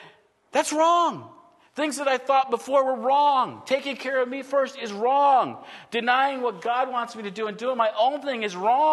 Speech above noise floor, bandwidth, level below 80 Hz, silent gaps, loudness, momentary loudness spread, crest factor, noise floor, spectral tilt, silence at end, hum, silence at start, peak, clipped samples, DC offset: 31 dB; 12.5 kHz; -82 dBFS; none; -24 LUFS; 10 LU; 18 dB; -54 dBFS; -3 dB/octave; 0 s; none; 0 s; -6 dBFS; under 0.1%; under 0.1%